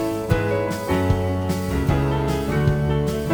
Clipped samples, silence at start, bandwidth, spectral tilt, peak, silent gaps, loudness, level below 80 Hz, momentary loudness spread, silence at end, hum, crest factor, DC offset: under 0.1%; 0 s; over 20 kHz; -7 dB/octave; -4 dBFS; none; -22 LUFS; -32 dBFS; 3 LU; 0 s; none; 16 dB; under 0.1%